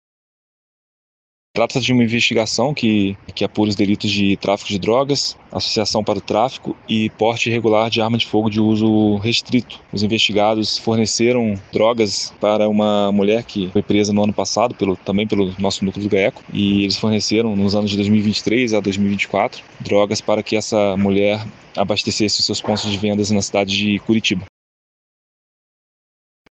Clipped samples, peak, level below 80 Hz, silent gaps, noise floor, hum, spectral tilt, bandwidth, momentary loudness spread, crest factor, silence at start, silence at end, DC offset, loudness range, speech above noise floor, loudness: under 0.1%; -2 dBFS; -52 dBFS; none; under -90 dBFS; none; -4.5 dB/octave; 8.6 kHz; 5 LU; 16 dB; 1.55 s; 2.05 s; under 0.1%; 2 LU; over 73 dB; -17 LUFS